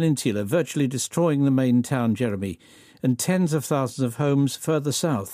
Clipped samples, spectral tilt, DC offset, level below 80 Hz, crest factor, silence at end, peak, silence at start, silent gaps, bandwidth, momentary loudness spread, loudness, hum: under 0.1%; -6 dB/octave; under 0.1%; -64 dBFS; 14 dB; 0 s; -8 dBFS; 0 s; none; 15.5 kHz; 6 LU; -23 LUFS; none